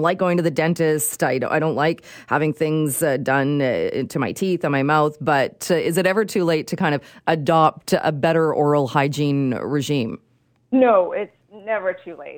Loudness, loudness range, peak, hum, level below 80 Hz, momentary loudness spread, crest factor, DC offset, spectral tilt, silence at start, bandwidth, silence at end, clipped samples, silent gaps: -20 LUFS; 2 LU; -2 dBFS; none; -62 dBFS; 6 LU; 18 dB; under 0.1%; -5.5 dB/octave; 0 s; 19 kHz; 0 s; under 0.1%; none